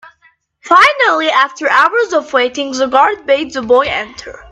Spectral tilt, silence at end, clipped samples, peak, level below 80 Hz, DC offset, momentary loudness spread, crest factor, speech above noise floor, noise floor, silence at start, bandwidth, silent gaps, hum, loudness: -2 dB/octave; 0.15 s; under 0.1%; 0 dBFS; -50 dBFS; under 0.1%; 9 LU; 12 dB; 41 dB; -53 dBFS; 0.05 s; 12 kHz; none; none; -12 LUFS